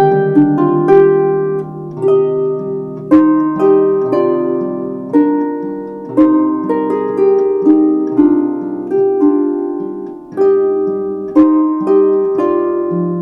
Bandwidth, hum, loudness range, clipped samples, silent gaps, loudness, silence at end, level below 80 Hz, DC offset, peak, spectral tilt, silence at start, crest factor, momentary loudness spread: 3.3 kHz; none; 2 LU; under 0.1%; none; -13 LUFS; 0 s; -56 dBFS; under 0.1%; 0 dBFS; -10.5 dB/octave; 0 s; 12 dB; 10 LU